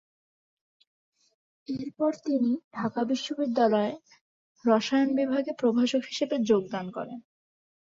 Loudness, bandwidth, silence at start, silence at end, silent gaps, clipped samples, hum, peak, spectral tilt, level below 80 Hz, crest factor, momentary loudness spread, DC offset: -27 LUFS; 7.8 kHz; 1.7 s; 0.65 s; 2.64-2.71 s, 4.21-4.55 s; under 0.1%; none; -10 dBFS; -5.5 dB/octave; -74 dBFS; 18 dB; 13 LU; under 0.1%